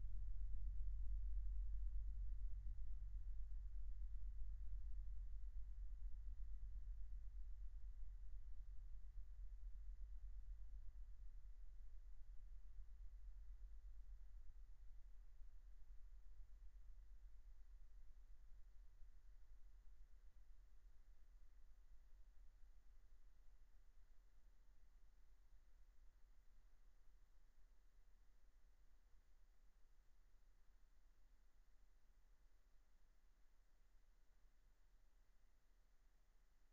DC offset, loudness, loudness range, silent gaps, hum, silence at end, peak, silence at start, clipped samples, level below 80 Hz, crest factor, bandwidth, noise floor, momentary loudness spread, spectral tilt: under 0.1%; -59 LUFS; 15 LU; none; none; 0.05 s; -34 dBFS; 0 s; under 0.1%; -56 dBFS; 18 dB; 2.1 kHz; -72 dBFS; 16 LU; -7.5 dB/octave